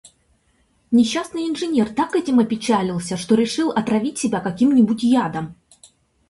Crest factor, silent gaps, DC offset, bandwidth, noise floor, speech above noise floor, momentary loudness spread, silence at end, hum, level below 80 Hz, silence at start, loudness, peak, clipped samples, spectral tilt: 14 dB; none; under 0.1%; 11.5 kHz; -62 dBFS; 43 dB; 8 LU; 0.75 s; none; -56 dBFS; 0.9 s; -19 LUFS; -4 dBFS; under 0.1%; -5.5 dB/octave